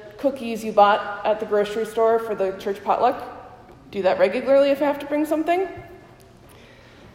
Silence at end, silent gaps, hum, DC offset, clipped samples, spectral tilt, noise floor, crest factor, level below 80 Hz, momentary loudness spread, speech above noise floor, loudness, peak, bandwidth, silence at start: 0.05 s; none; none; under 0.1%; under 0.1%; -5.5 dB/octave; -47 dBFS; 18 dB; -58 dBFS; 12 LU; 27 dB; -21 LUFS; -4 dBFS; 16 kHz; 0 s